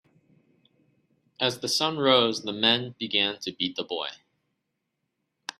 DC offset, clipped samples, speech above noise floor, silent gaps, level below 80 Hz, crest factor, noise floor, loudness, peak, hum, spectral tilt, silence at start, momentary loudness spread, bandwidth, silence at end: under 0.1%; under 0.1%; 54 dB; none; -72 dBFS; 22 dB; -80 dBFS; -25 LUFS; -6 dBFS; none; -3 dB/octave; 1.4 s; 11 LU; 14 kHz; 1.45 s